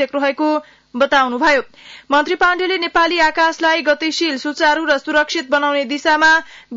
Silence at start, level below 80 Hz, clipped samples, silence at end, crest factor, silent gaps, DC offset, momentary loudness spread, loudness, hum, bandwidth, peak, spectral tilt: 0 s; -52 dBFS; under 0.1%; 0 s; 12 dB; none; under 0.1%; 6 LU; -15 LUFS; none; 7.8 kHz; -4 dBFS; -1.5 dB/octave